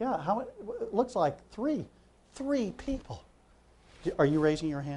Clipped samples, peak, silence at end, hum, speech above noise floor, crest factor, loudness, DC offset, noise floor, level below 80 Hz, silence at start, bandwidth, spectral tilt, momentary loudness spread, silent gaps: under 0.1%; -12 dBFS; 0 s; none; 31 dB; 20 dB; -32 LUFS; under 0.1%; -61 dBFS; -54 dBFS; 0 s; 11 kHz; -7 dB/octave; 13 LU; none